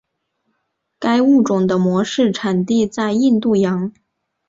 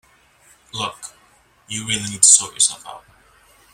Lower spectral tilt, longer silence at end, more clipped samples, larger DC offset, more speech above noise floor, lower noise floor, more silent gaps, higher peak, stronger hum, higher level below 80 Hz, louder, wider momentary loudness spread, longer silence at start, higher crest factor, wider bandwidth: first, -6.5 dB/octave vs 0 dB/octave; second, 0.6 s vs 0.75 s; neither; neither; first, 56 dB vs 36 dB; first, -72 dBFS vs -55 dBFS; neither; second, -4 dBFS vs 0 dBFS; neither; about the same, -58 dBFS vs -60 dBFS; about the same, -16 LUFS vs -15 LUFS; second, 6 LU vs 26 LU; first, 1 s vs 0.75 s; second, 14 dB vs 22 dB; second, 7.8 kHz vs 16.5 kHz